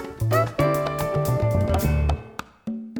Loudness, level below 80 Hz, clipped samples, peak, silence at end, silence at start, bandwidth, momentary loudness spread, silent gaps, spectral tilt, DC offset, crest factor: -23 LUFS; -32 dBFS; under 0.1%; -8 dBFS; 0 s; 0 s; over 20 kHz; 12 LU; none; -7 dB/octave; under 0.1%; 16 dB